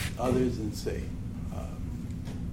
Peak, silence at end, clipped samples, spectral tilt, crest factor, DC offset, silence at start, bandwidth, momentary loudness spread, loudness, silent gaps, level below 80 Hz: -14 dBFS; 0 s; under 0.1%; -6.5 dB/octave; 18 dB; under 0.1%; 0 s; 16.5 kHz; 10 LU; -33 LUFS; none; -40 dBFS